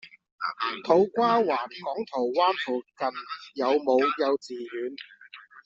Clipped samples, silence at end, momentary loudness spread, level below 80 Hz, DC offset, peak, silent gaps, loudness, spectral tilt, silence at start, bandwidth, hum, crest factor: under 0.1%; 0.05 s; 15 LU; -74 dBFS; under 0.1%; -8 dBFS; 0.32-0.38 s; -26 LUFS; -2.5 dB/octave; 0.05 s; 7.8 kHz; none; 20 dB